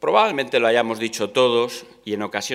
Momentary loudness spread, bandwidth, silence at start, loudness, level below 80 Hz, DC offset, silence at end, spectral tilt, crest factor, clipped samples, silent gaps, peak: 10 LU; 15.5 kHz; 0 s; -20 LUFS; -70 dBFS; under 0.1%; 0 s; -3.5 dB/octave; 18 dB; under 0.1%; none; -2 dBFS